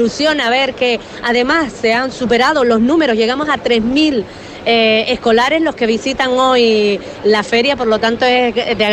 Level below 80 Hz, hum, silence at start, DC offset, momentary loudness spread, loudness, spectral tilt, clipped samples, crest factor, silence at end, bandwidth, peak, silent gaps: -44 dBFS; none; 0 s; under 0.1%; 5 LU; -13 LUFS; -4 dB/octave; under 0.1%; 12 dB; 0 s; 10.5 kHz; -2 dBFS; none